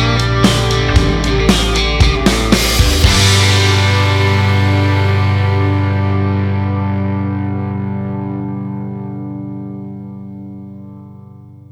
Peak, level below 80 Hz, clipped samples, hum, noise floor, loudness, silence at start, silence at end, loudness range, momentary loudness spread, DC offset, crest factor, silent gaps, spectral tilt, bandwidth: 0 dBFS; -22 dBFS; under 0.1%; 50 Hz at -40 dBFS; -36 dBFS; -13 LUFS; 0 s; 0.15 s; 13 LU; 17 LU; under 0.1%; 14 dB; none; -5 dB/octave; 16.5 kHz